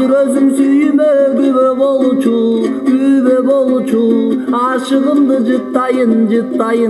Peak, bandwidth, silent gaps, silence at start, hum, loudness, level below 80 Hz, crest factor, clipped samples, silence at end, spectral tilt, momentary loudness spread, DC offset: 0 dBFS; 12 kHz; none; 0 s; none; -12 LUFS; -58 dBFS; 10 dB; under 0.1%; 0 s; -6.5 dB/octave; 4 LU; under 0.1%